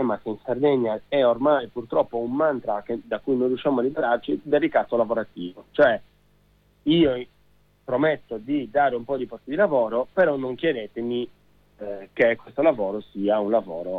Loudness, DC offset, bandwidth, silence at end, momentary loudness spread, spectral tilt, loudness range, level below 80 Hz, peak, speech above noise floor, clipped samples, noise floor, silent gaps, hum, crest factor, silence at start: -24 LUFS; under 0.1%; 4.8 kHz; 0 s; 10 LU; -8.5 dB/octave; 2 LU; -58 dBFS; -8 dBFS; 38 dB; under 0.1%; -61 dBFS; none; 50 Hz at -60 dBFS; 16 dB; 0 s